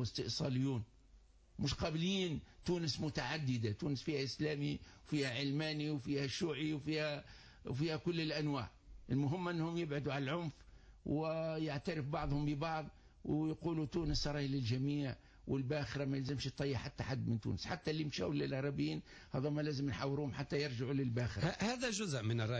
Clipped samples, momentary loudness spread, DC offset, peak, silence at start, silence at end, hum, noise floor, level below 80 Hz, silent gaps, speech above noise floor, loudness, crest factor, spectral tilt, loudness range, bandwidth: under 0.1%; 5 LU; under 0.1%; -26 dBFS; 0 s; 0 s; none; -65 dBFS; -58 dBFS; none; 26 dB; -39 LUFS; 14 dB; -6 dB/octave; 1 LU; 8 kHz